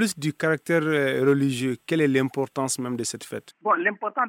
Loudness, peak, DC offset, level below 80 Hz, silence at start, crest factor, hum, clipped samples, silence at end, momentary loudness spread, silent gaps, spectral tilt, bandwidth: -24 LUFS; -8 dBFS; under 0.1%; -70 dBFS; 0 s; 16 dB; none; under 0.1%; 0 s; 8 LU; none; -5 dB/octave; 16.5 kHz